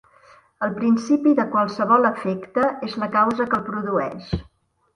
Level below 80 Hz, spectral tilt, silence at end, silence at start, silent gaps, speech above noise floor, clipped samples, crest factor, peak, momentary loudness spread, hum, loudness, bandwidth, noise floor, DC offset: -48 dBFS; -7 dB/octave; 0.55 s; 0.6 s; none; 32 dB; under 0.1%; 18 dB; -4 dBFS; 10 LU; none; -21 LUFS; 10.5 kHz; -52 dBFS; under 0.1%